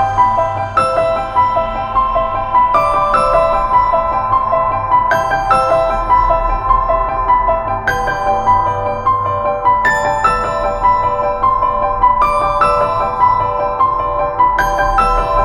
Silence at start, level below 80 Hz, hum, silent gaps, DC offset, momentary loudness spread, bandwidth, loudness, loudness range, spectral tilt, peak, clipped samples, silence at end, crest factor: 0 s; -28 dBFS; none; none; 0.1%; 4 LU; 12.5 kHz; -13 LUFS; 1 LU; -5.5 dB/octave; 0 dBFS; under 0.1%; 0 s; 12 dB